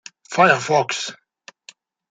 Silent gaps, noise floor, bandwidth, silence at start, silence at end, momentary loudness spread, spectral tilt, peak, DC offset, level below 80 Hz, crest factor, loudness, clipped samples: none; -49 dBFS; 9.4 kHz; 0.3 s; 0.95 s; 12 LU; -3.5 dB/octave; -2 dBFS; under 0.1%; -68 dBFS; 20 dB; -18 LUFS; under 0.1%